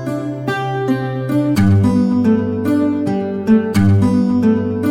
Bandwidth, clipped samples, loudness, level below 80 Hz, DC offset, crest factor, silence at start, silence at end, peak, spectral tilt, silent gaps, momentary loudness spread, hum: 15.5 kHz; under 0.1%; -15 LUFS; -44 dBFS; under 0.1%; 12 dB; 0 s; 0 s; -2 dBFS; -8 dB/octave; none; 7 LU; none